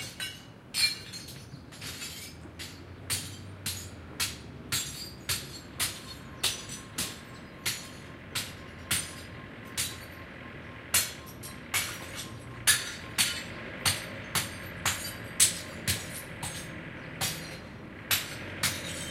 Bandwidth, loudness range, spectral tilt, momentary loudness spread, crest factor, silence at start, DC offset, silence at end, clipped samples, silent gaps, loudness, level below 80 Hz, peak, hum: 16 kHz; 6 LU; -1 dB/octave; 17 LU; 28 dB; 0 s; under 0.1%; 0 s; under 0.1%; none; -31 LUFS; -56 dBFS; -8 dBFS; none